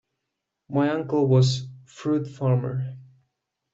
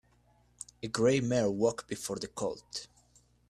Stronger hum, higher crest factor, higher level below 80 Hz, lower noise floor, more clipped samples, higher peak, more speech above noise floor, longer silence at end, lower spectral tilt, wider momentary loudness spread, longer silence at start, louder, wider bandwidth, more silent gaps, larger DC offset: second, none vs 60 Hz at -55 dBFS; about the same, 16 dB vs 20 dB; about the same, -60 dBFS vs -64 dBFS; first, -82 dBFS vs -67 dBFS; neither; first, -8 dBFS vs -14 dBFS; first, 59 dB vs 35 dB; about the same, 0.7 s vs 0.65 s; first, -7 dB/octave vs -5 dB/octave; second, 13 LU vs 18 LU; second, 0.7 s vs 0.85 s; first, -24 LUFS vs -32 LUFS; second, 7.8 kHz vs 14 kHz; neither; neither